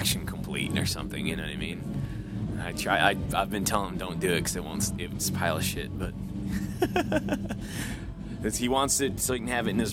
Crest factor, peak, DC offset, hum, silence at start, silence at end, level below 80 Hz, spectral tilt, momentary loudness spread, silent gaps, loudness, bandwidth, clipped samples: 22 dB; -8 dBFS; under 0.1%; none; 0 s; 0 s; -44 dBFS; -4 dB/octave; 10 LU; none; -29 LUFS; 17 kHz; under 0.1%